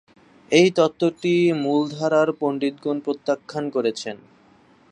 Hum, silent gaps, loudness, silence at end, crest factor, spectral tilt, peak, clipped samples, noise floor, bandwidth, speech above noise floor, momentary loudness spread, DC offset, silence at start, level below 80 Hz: none; none; -21 LUFS; 0.75 s; 20 dB; -5.5 dB/octave; -2 dBFS; under 0.1%; -54 dBFS; 9.6 kHz; 34 dB; 9 LU; under 0.1%; 0.5 s; -68 dBFS